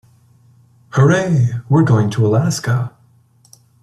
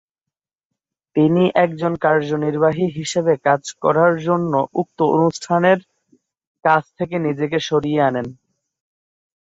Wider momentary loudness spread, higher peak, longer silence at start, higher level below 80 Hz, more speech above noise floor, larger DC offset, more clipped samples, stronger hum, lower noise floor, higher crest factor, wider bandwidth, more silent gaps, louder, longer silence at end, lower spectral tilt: about the same, 8 LU vs 6 LU; about the same, -2 dBFS vs -2 dBFS; second, 0.95 s vs 1.15 s; first, -52 dBFS vs -60 dBFS; second, 39 dB vs 68 dB; neither; neither; neither; second, -52 dBFS vs -86 dBFS; about the same, 16 dB vs 16 dB; first, 13 kHz vs 8 kHz; second, none vs 6.47-6.55 s; first, -15 LUFS vs -18 LUFS; second, 0.95 s vs 1.2 s; about the same, -7 dB/octave vs -6 dB/octave